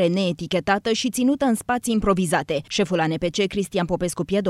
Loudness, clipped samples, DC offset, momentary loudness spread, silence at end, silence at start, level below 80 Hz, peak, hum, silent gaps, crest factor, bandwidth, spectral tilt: -22 LUFS; under 0.1%; under 0.1%; 4 LU; 0 s; 0 s; -44 dBFS; -4 dBFS; none; none; 18 dB; 15 kHz; -5 dB/octave